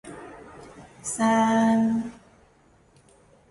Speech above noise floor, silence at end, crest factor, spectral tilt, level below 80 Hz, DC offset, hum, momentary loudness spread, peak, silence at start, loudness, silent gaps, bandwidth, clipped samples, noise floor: 37 dB; 1.4 s; 16 dB; -5 dB/octave; -62 dBFS; under 0.1%; none; 24 LU; -10 dBFS; 0.05 s; -23 LUFS; none; 11.5 kHz; under 0.1%; -59 dBFS